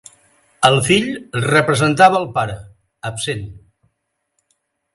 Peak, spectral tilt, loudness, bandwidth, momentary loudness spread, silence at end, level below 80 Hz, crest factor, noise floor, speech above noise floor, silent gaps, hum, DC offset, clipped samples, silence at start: 0 dBFS; -4.5 dB/octave; -16 LUFS; 11.5 kHz; 16 LU; 1.4 s; -50 dBFS; 18 dB; -73 dBFS; 57 dB; none; none; under 0.1%; under 0.1%; 0.6 s